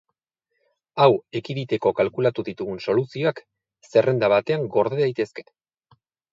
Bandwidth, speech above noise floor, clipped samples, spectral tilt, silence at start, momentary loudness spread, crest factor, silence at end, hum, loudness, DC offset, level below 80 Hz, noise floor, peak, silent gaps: 7.6 kHz; 57 dB; under 0.1%; -7.5 dB/octave; 0.95 s; 12 LU; 20 dB; 0.9 s; none; -22 LUFS; under 0.1%; -64 dBFS; -79 dBFS; -2 dBFS; none